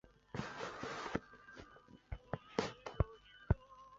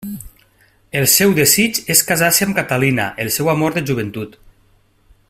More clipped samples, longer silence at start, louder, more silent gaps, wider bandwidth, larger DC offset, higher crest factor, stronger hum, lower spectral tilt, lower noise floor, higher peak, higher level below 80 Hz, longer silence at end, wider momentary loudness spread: neither; about the same, 0.05 s vs 0 s; second, -44 LUFS vs -14 LUFS; neither; second, 7.6 kHz vs 16 kHz; neither; first, 28 dB vs 18 dB; neither; first, -5.5 dB/octave vs -3 dB/octave; first, -61 dBFS vs -55 dBFS; second, -16 dBFS vs 0 dBFS; about the same, -50 dBFS vs -48 dBFS; second, 0 s vs 1 s; about the same, 17 LU vs 15 LU